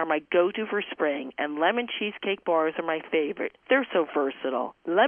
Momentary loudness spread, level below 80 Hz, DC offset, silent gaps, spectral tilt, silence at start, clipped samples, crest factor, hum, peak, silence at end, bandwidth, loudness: 6 LU; -74 dBFS; under 0.1%; none; -7.5 dB/octave; 0 s; under 0.1%; 16 dB; none; -10 dBFS; 0 s; 3.6 kHz; -27 LUFS